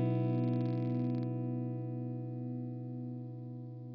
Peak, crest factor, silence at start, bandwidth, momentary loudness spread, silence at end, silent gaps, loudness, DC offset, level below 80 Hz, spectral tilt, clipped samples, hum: -22 dBFS; 14 dB; 0 s; 4.9 kHz; 12 LU; 0 s; none; -37 LUFS; under 0.1%; -88 dBFS; -12 dB/octave; under 0.1%; 50 Hz at -80 dBFS